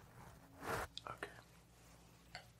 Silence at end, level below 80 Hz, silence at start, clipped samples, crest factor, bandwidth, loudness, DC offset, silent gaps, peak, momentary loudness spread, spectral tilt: 0 s; -66 dBFS; 0 s; under 0.1%; 24 dB; 16 kHz; -49 LUFS; under 0.1%; none; -28 dBFS; 19 LU; -3.5 dB/octave